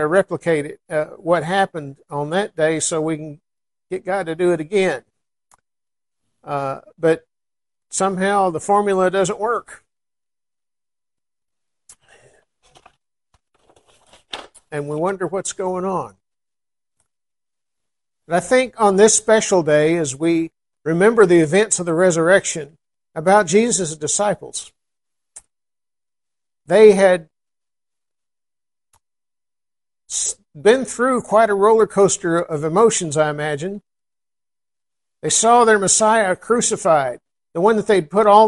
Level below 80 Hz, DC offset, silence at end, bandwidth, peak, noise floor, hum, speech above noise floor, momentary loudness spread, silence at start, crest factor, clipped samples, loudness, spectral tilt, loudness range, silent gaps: -60 dBFS; under 0.1%; 0 s; 11.5 kHz; 0 dBFS; under -90 dBFS; none; over 73 dB; 16 LU; 0 s; 20 dB; under 0.1%; -17 LUFS; -4 dB/octave; 10 LU; none